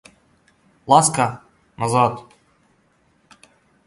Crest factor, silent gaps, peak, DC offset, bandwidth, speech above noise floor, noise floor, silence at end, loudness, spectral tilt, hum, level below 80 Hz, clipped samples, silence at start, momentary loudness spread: 22 dB; none; 0 dBFS; under 0.1%; 11.5 kHz; 44 dB; -61 dBFS; 1.65 s; -18 LUFS; -4 dB/octave; none; -58 dBFS; under 0.1%; 0.85 s; 24 LU